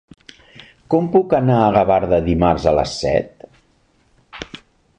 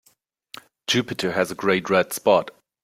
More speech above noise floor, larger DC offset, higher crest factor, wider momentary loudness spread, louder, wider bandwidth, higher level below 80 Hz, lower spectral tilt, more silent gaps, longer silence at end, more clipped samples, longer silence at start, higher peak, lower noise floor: about the same, 43 dB vs 42 dB; neither; about the same, 16 dB vs 20 dB; second, 19 LU vs 22 LU; first, -16 LUFS vs -22 LUFS; second, 10 kHz vs 16.5 kHz; first, -38 dBFS vs -64 dBFS; first, -7 dB/octave vs -4 dB/octave; neither; about the same, 0.4 s vs 0.35 s; neither; about the same, 0.9 s vs 0.9 s; about the same, -2 dBFS vs -4 dBFS; second, -58 dBFS vs -64 dBFS